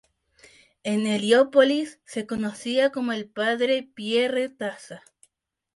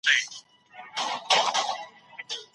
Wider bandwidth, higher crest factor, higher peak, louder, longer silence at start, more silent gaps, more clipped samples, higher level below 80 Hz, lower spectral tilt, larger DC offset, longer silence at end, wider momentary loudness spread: about the same, 11.5 kHz vs 11.5 kHz; about the same, 18 dB vs 22 dB; about the same, -6 dBFS vs -8 dBFS; about the same, -24 LUFS vs -26 LUFS; first, 0.85 s vs 0.05 s; neither; neither; first, -68 dBFS vs -82 dBFS; first, -4.5 dB/octave vs 1 dB/octave; neither; first, 0.8 s vs 0.1 s; second, 15 LU vs 21 LU